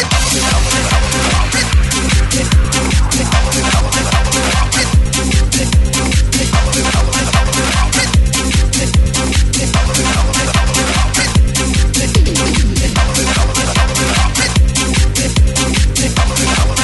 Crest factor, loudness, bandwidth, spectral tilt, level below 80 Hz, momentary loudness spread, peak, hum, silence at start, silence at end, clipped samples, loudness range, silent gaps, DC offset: 12 dB; -12 LUFS; 12 kHz; -3.5 dB/octave; -14 dBFS; 1 LU; 0 dBFS; none; 0 s; 0 s; under 0.1%; 0 LU; none; 0.2%